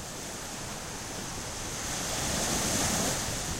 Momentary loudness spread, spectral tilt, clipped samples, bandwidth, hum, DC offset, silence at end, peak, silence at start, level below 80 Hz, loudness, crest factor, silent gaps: 10 LU; -2.5 dB/octave; under 0.1%; 16 kHz; none; under 0.1%; 0 s; -16 dBFS; 0 s; -46 dBFS; -31 LUFS; 18 dB; none